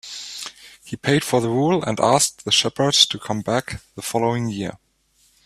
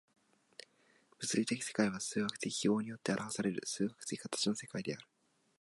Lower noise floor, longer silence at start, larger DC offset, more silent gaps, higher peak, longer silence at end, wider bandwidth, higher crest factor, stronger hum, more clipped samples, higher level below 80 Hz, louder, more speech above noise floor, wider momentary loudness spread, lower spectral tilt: second, -61 dBFS vs -70 dBFS; second, 0.05 s vs 1.2 s; neither; neither; first, 0 dBFS vs -18 dBFS; first, 0.7 s vs 0.55 s; first, 15.5 kHz vs 11.5 kHz; about the same, 22 dB vs 20 dB; neither; neither; first, -54 dBFS vs -78 dBFS; first, -19 LUFS vs -37 LUFS; first, 41 dB vs 33 dB; first, 16 LU vs 12 LU; about the same, -3.5 dB/octave vs -4 dB/octave